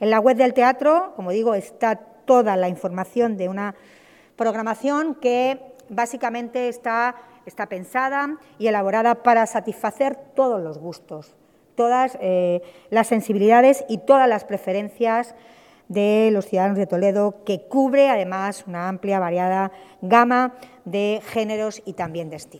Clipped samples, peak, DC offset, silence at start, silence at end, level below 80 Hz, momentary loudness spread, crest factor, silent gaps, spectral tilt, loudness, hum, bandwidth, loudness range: under 0.1%; 0 dBFS; under 0.1%; 0 s; 0 s; -70 dBFS; 13 LU; 20 dB; none; -6 dB/octave; -21 LUFS; none; 15.5 kHz; 5 LU